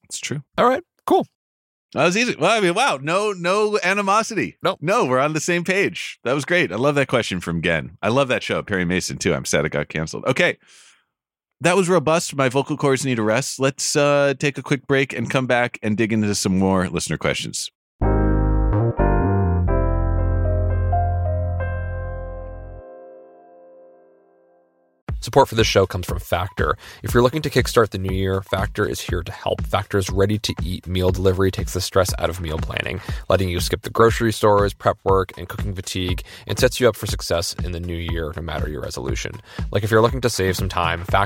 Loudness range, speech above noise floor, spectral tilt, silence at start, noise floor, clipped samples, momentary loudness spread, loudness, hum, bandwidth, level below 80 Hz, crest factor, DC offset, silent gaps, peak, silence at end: 4 LU; 64 dB; -5 dB/octave; 0.1 s; -84 dBFS; under 0.1%; 10 LU; -20 LUFS; none; 16.5 kHz; -32 dBFS; 18 dB; under 0.1%; 1.35-1.89 s, 17.75-17.99 s, 25.02-25.07 s; -2 dBFS; 0 s